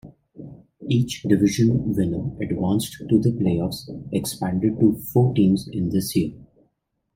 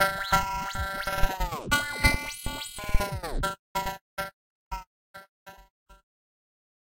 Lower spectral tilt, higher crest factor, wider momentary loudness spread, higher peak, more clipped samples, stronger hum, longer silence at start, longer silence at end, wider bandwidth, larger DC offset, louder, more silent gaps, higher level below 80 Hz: first, -7 dB/octave vs -3 dB/octave; second, 18 dB vs 24 dB; second, 10 LU vs 16 LU; about the same, -4 dBFS vs -6 dBFS; neither; neither; about the same, 0.05 s vs 0 s; second, 0.7 s vs 0.95 s; about the same, 16.5 kHz vs 16 kHz; neither; first, -22 LUFS vs -29 LUFS; second, none vs 3.59-3.75 s, 4.01-4.17 s, 4.33-4.71 s, 4.87-5.14 s, 5.29-5.46 s, 5.70-5.86 s; second, -50 dBFS vs -36 dBFS